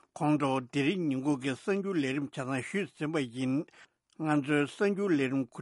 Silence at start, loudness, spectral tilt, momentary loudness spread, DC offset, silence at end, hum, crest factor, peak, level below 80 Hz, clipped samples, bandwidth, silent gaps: 0.15 s; -31 LUFS; -6.5 dB/octave; 7 LU; under 0.1%; 0 s; none; 18 dB; -14 dBFS; -74 dBFS; under 0.1%; 11.5 kHz; none